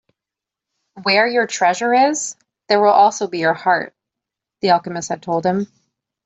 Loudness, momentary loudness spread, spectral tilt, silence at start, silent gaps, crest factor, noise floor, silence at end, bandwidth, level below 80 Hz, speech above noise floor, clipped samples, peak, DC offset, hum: -17 LUFS; 11 LU; -3.5 dB/octave; 0.95 s; none; 16 dB; -86 dBFS; 0.6 s; 8.2 kHz; -66 dBFS; 70 dB; under 0.1%; -2 dBFS; under 0.1%; none